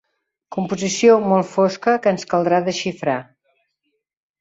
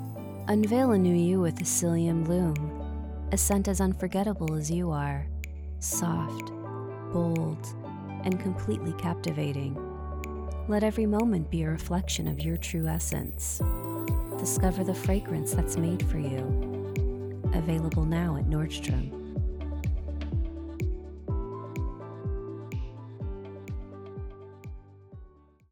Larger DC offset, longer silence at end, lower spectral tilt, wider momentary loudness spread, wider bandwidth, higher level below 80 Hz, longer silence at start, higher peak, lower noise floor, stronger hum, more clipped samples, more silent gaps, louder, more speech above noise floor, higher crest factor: neither; first, 1.2 s vs 0.45 s; about the same, -5 dB/octave vs -6 dB/octave; about the same, 11 LU vs 13 LU; second, 8 kHz vs 19.5 kHz; second, -62 dBFS vs -38 dBFS; first, 0.5 s vs 0 s; first, -2 dBFS vs -12 dBFS; first, -74 dBFS vs -53 dBFS; neither; neither; neither; first, -18 LUFS vs -30 LUFS; first, 56 dB vs 26 dB; about the same, 18 dB vs 18 dB